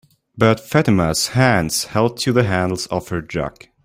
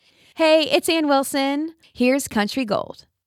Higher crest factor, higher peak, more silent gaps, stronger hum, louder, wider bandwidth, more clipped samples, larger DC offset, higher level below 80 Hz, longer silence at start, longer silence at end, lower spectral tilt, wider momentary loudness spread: about the same, 18 dB vs 16 dB; about the same, -2 dBFS vs -4 dBFS; neither; neither; about the same, -18 LUFS vs -20 LUFS; about the same, 16 kHz vs 16.5 kHz; neither; neither; first, -44 dBFS vs -58 dBFS; about the same, 0.35 s vs 0.35 s; about the same, 0.35 s vs 0.35 s; first, -5 dB/octave vs -3.5 dB/octave; about the same, 9 LU vs 9 LU